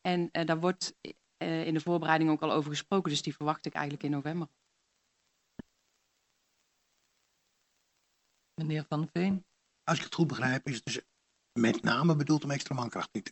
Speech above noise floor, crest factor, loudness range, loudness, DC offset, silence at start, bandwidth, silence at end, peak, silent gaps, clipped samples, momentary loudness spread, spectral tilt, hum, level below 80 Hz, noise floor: 46 dB; 22 dB; 11 LU; -32 LUFS; under 0.1%; 0.05 s; 8.4 kHz; 0 s; -10 dBFS; none; under 0.1%; 12 LU; -5.5 dB/octave; none; -74 dBFS; -77 dBFS